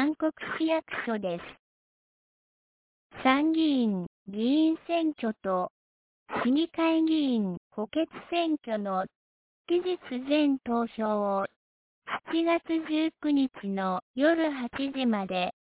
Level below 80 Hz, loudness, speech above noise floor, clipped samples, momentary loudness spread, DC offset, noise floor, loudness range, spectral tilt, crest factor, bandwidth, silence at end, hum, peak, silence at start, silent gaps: -68 dBFS; -29 LUFS; over 62 dB; under 0.1%; 9 LU; under 0.1%; under -90 dBFS; 3 LU; -4 dB/octave; 18 dB; 4 kHz; 0.1 s; none; -12 dBFS; 0 s; 1.59-3.10 s, 4.07-4.26 s, 5.70-6.26 s, 7.57-7.70 s, 9.15-9.65 s, 11.56-12.02 s, 14.02-14.14 s